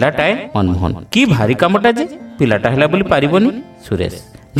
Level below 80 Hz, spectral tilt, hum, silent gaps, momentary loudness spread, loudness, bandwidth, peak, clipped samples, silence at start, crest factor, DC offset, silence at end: -38 dBFS; -6.5 dB/octave; none; none; 11 LU; -15 LUFS; 15.5 kHz; 0 dBFS; under 0.1%; 0 s; 14 dB; under 0.1%; 0 s